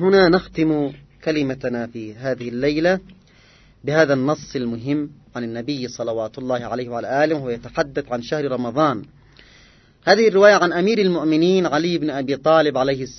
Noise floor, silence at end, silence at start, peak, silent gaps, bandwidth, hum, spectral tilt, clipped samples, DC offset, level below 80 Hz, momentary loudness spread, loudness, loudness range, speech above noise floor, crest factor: -51 dBFS; 0 s; 0 s; 0 dBFS; none; 6.4 kHz; none; -6 dB/octave; under 0.1%; under 0.1%; -52 dBFS; 12 LU; -20 LUFS; 7 LU; 32 dB; 20 dB